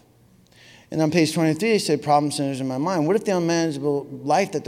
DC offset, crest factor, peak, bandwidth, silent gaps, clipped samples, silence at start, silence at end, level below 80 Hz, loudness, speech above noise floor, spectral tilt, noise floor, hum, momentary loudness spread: under 0.1%; 18 dB; -6 dBFS; 16 kHz; none; under 0.1%; 0.9 s; 0 s; -66 dBFS; -22 LUFS; 34 dB; -5.5 dB/octave; -55 dBFS; none; 6 LU